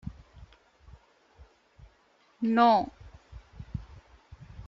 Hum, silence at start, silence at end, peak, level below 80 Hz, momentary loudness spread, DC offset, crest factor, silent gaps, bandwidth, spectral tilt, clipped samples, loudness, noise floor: none; 0.05 s; 0.05 s; -8 dBFS; -52 dBFS; 28 LU; under 0.1%; 24 dB; none; 7.2 kHz; -7.5 dB/octave; under 0.1%; -25 LUFS; -65 dBFS